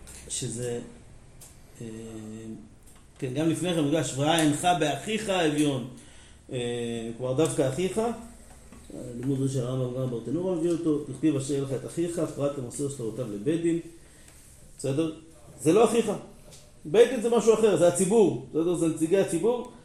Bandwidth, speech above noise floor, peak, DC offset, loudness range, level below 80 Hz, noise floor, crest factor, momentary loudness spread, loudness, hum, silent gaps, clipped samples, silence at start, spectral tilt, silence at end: 14 kHz; 25 dB; -6 dBFS; under 0.1%; 8 LU; -56 dBFS; -51 dBFS; 20 dB; 18 LU; -27 LUFS; none; none; under 0.1%; 0 s; -5.5 dB/octave; 0 s